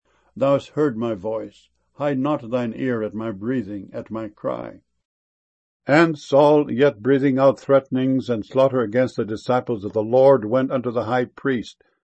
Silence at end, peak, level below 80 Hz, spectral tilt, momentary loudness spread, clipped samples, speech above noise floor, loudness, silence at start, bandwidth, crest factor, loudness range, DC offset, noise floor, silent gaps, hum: 0.3 s; -2 dBFS; -62 dBFS; -7.5 dB/octave; 13 LU; under 0.1%; over 70 dB; -20 LUFS; 0.35 s; 8.4 kHz; 18 dB; 8 LU; under 0.1%; under -90 dBFS; 5.05-5.80 s; none